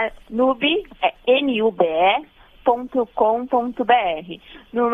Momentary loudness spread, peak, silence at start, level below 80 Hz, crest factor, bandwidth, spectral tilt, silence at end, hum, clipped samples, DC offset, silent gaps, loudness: 7 LU; -2 dBFS; 0 s; -52 dBFS; 18 dB; 3.9 kHz; -6.5 dB/octave; 0 s; none; under 0.1%; under 0.1%; none; -20 LUFS